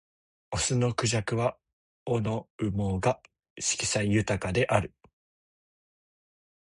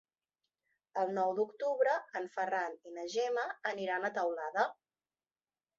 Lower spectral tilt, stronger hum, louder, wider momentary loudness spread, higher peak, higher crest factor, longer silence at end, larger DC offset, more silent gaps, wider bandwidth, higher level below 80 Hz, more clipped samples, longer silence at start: first, -4.5 dB/octave vs -2 dB/octave; neither; first, -28 LUFS vs -35 LUFS; about the same, 7 LU vs 7 LU; first, -8 dBFS vs -18 dBFS; about the same, 22 dB vs 20 dB; first, 1.8 s vs 1.05 s; neither; first, 1.73-2.06 s, 2.50-2.59 s, 3.50-3.56 s vs none; first, 11.5 kHz vs 7.6 kHz; first, -50 dBFS vs -88 dBFS; neither; second, 0.5 s vs 0.95 s